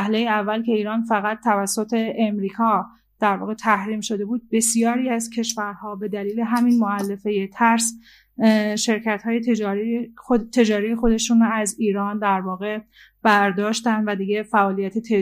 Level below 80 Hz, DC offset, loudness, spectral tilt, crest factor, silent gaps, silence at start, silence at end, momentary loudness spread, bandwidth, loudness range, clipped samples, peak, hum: -48 dBFS; under 0.1%; -21 LUFS; -4 dB/octave; 18 dB; none; 0 s; 0 s; 8 LU; 15.5 kHz; 2 LU; under 0.1%; -4 dBFS; none